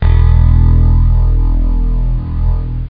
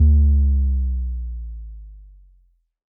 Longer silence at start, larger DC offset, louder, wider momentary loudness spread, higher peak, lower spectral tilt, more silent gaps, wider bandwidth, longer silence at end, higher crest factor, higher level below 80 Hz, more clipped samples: about the same, 0 s vs 0 s; neither; first, -13 LUFS vs -20 LUFS; second, 8 LU vs 22 LU; first, 0 dBFS vs -6 dBFS; second, -11.5 dB/octave vs -19.5 dB/octave; neither; first, 3.8 kHz vs 0.7 kHz; second, 0 s vs 0.95 s; about the same, 8 dB vs 12 dB; first, -10 dBFS vs -20 dBFS; neither